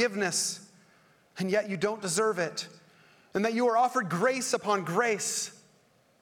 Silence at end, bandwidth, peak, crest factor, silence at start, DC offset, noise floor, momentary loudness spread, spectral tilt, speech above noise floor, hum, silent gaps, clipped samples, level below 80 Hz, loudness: 0.65 s; 19 kHz; -12 dBFS; 18 dB; 0 s; under 0.1%; -65 dBFS; 11 LU; -3 dB/octave; 36 dB; none; none; under 0.1%; -76 dBFS; -29 LUFS